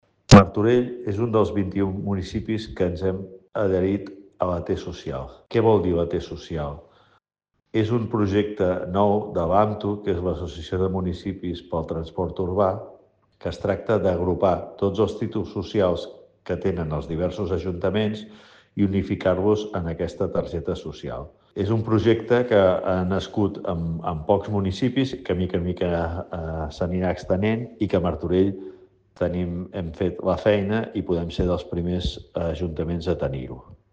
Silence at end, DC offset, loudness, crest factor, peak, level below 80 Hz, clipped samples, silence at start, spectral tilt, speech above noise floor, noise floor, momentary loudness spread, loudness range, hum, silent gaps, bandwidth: 0.2 s; under 0.1%; -24 LUFS; 24 dB; 0 dBFS; -42 dBFS; under 0.1%; 0.3 s; -7 dB/octave; 52 dB; -76 dBFS; 11 LU; 4 LU; none; none; 9.6 kHz